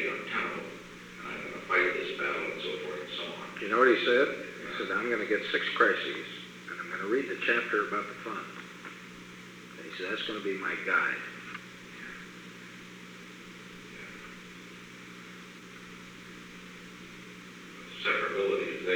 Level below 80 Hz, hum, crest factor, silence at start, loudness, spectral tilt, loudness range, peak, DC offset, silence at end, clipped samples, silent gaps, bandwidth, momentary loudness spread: -70 dBFS; 60 Hz at -65 dBFS; 24 dB; 0 s; -30 LUFS; -4 dB/octave; 18 LU; -10 dBFS; under 0.1%; 0 s; under 0.1%; none; over 20 kHz; 20 LU